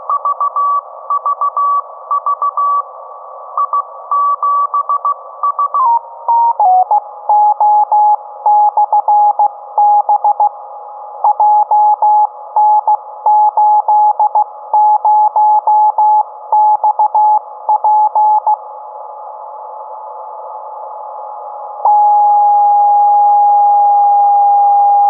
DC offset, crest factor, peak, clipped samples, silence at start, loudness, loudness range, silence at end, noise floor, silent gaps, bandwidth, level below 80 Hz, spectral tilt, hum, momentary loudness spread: under 0.1%; 10 dB; -2 dBFS; under 0.1%; 0 s; -11 LUFS; 6 LU; 0 s; -30 dBFS; none; 1.5 kHz; under -90 dBFS; -5.5 dB/octave; none; 18 LU